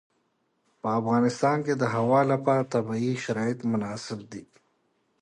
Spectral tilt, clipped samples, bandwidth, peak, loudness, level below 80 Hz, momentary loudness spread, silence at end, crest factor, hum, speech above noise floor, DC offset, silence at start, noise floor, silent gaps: -6.5 dB/octave; under 0.1%; 10.5 kHz; -10 dBFS; -26 LUFS; -68 dBFS; 13 LU; 0.8 s; 16 dB; none; 47 dB; under 0.1%; 0.85 s; -72 dBFS; none